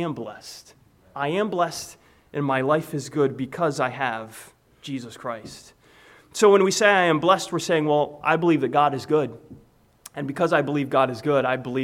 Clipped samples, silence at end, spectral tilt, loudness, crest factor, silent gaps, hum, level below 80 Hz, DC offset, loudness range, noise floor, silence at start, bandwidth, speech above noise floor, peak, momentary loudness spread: under 0.1%; 0 s; -5 dB/octave; -22 LUFS; 20 dB; none; none; -64 dBFS; under 0.1%; 7 LU; -52 dBFS; 0 s; 16 kHz; 30 dB; -4 dBFS; 19 LU